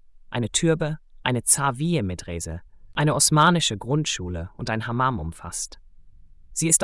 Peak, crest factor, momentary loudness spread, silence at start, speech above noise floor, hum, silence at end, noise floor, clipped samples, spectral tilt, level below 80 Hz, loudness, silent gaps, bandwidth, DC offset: -2 dBFS; 22 dB; 15 LU; 0.15 s; 24 dB; none; 0 s; -47 dBFS; under 0.1%; -3.5 dB/octave; -46 dBFS; -23 LUFS; none; 12 kHz; under 0.1%